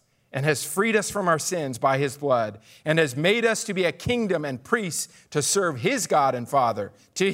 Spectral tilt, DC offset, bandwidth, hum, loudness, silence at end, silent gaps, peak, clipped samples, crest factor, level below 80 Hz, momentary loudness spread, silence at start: -4 dB/octave; under 0.1%; 16 kHz; none; -24 LUFS; 0 s; none; -6 dBFS; under 0.1%; 18 dB; -60 dBFS; 8 LU; 0.35 s